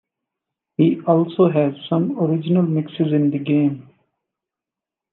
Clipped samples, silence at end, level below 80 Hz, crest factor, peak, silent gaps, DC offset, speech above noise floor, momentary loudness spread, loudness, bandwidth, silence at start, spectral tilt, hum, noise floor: under 0.1%; 1.3 s; -72 dBFS; 18 dB; -2 dBFS; none; under 0.1%; 69 dB; 5 LU; -19 LUFS; 4.1 kHz; 0.8 s; -11.5 dB/octave; none; -87 dBFS